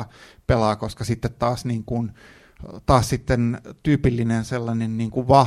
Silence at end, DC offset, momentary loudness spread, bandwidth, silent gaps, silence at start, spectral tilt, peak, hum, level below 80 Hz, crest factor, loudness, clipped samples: 0 s; under 0.1%; 12 LU; 14 kHz; none; 0 s; -7 dB/octave; -2 dBFS; none; -38 dBFS; 20 dB; -23 LUFS; under 0.1%